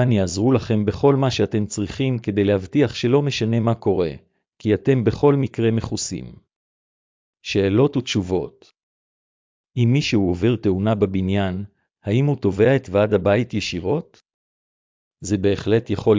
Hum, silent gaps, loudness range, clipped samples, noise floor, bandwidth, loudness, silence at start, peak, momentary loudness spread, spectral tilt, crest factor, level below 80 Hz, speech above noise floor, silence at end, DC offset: none; 6.56-7.33 s, 8.83-9.64 s, 14.34-15.11 s; 3 LU; under 0.1%; under -90 dBFS; 7.6 kHz; -20 LUFS; 0 s; -4 dBFS; 8 LU; -6.5 dB/octave; 16 dB; -44 dBFS; over 71 dB; 0 s; under 0.1%